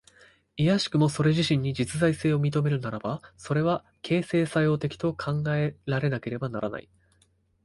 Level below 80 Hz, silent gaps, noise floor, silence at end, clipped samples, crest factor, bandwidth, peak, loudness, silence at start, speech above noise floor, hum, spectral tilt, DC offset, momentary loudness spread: -56 dBFS; none; -66 dBFS; 0.85 s; under 0.1%; 18 dB; 11.5 kHz; -10 dBFS; -27 LUFS; 0.55 s; 40 dB; none; -6.5 dB/octave; under 0.1%; 9 LU